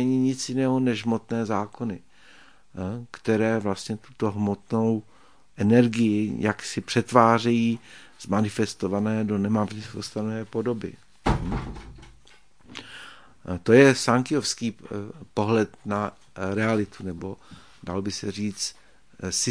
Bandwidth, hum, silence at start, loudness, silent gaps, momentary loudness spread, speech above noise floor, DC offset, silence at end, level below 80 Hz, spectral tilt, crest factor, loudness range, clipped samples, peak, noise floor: 10.5 kHz; none; 0 s; -25 LUFS; none; 17 LU; 33 dB; 0.2%; 0 s; -48 dBFS; -5.5 dB/octave; 24 dB; 7 LU; under 0.1%; 0 dBFS; -57 dBFS